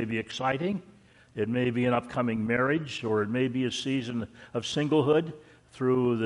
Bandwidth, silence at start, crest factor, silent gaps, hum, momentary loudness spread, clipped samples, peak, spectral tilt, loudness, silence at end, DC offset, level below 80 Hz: 11.5 kHz; 0 s; 16 dB; none; none; 9 LU; under 0.1%; -12 dBFS; -6 dB/octave; -28 LUFS; 0 s; under 0.1%; -62 dBFS